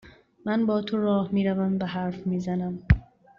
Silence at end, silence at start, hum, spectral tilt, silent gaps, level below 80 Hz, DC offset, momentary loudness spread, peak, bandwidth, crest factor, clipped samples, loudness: 0.35 s; 0.05 s; none; -7 dB/octave; none; -38 dBFS; under 0.1%; 5 LU; -4 dBFS; 7 kHz; 22 dB; under 0.1%; -26 LUFS